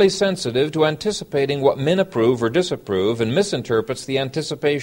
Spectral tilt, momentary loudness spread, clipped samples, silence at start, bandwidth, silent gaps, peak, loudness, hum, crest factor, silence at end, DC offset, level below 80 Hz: -5 dB/octave; 5 LU; under 0.1%; 0 s; 16.5 kHz; none; -4 dBFS; -20 LUFS; none; 16 dB; 0 s; under 0.1%; -54 dBFS